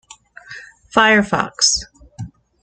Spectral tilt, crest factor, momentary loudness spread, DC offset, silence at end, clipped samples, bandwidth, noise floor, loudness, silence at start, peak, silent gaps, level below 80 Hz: -2 dB/octave; 18 dB; 23 LU; under 0.1%; 0.35 s; under 0.1%; 10 kHz; -41 dBFS; -15 LUFS; 0.5 s; 0 dBFS; none; -46 dBFS